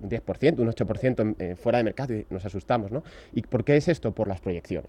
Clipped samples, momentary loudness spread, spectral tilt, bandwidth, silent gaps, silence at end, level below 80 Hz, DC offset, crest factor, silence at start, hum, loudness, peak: under 0.1%; 11 LU; -8 dB/octave; 10.5 kHz; none; 0 s; -50 dBFS; under 0.1%; 18 dB; 0 s; none; -27 LUFS; -10 dBFS